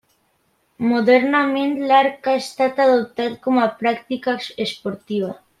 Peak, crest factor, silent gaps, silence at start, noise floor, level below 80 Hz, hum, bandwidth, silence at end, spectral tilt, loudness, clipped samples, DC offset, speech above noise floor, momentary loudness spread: -2 dBFS; 18 dB; none; 0.8 s; -65 dBFS; -66 dBFS; none; 13 kHz; 0.25 s; -5 dB/octave; -19 LUFS; under 0.1%; under 0.1%; 46 dB; 10 LU